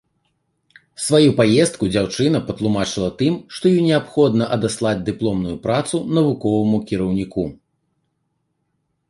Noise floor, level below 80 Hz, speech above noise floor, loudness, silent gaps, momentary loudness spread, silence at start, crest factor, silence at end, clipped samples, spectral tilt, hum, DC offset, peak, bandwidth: -71 dBFS; -48 dBFS; 53 dB; -19 LUFS; none; 7 LU; 1 s; 18 dB; 1.55 s; under 0.1%; -6 dB/octave; none; under 0.1%; -2 dBFS; 11.5 kHz